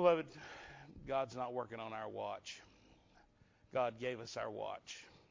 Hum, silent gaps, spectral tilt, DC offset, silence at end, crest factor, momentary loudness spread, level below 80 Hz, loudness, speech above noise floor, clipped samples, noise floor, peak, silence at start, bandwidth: none; none; -5 dB/octave; under 0.1%; 0.1 s; 24 dB; 14 LU; -72 dBFS; -42 LUFS; 29 dB; under 0.1%; -69 dBFS; -18 dBFS; 0 s; 7.6 kHz